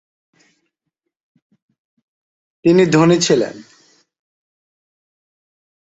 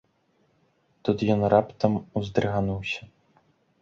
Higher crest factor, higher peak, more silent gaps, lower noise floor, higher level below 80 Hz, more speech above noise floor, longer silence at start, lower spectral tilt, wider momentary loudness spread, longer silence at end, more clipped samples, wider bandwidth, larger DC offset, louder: about the same, 18 dB vs 22 dB; first, -2 dBFS vs -6 dBFS; neither; first, -78 dBFS vs -67 dBFS; second, -60 dBFS vs -52 dBFS; first, 65 dB vs 43 dB; first, 2.65 s vs 1.05 s; second, -5.5 dB/octave vs -7.5 dB/octave; second, 7 LU vs 11 LU; first, 2.3 s vs 0.75 s; neither; first, 8.2 kHz vs 7.4 kHz; neither; first, -14 LUFS vs -26 LUFS